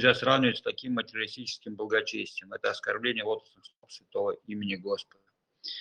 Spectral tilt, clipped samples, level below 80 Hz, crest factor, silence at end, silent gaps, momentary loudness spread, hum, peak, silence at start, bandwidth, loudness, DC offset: -4.5 dB/octave; under 0.1%; -72 dBFS; 26 dB; 0 s; none; 13 LU; none; -6 dBFS; 0 s; 9.6 kHz; -31 LUFS; under 0.1%